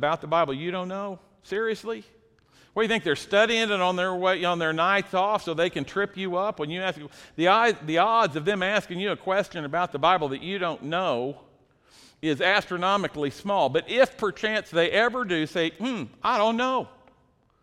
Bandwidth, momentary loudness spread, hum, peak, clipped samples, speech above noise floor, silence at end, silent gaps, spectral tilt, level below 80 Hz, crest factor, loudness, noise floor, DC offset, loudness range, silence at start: 14 kHz; 9 LU; none; -6 dBFS; under 0.1%; 39 dB; 0.75 s; none; -4.5 dB/octave; -62 dBFS; 18 dB; -25 LUFS; -64 dBFS; under 0.1%; 3 LU; 0 s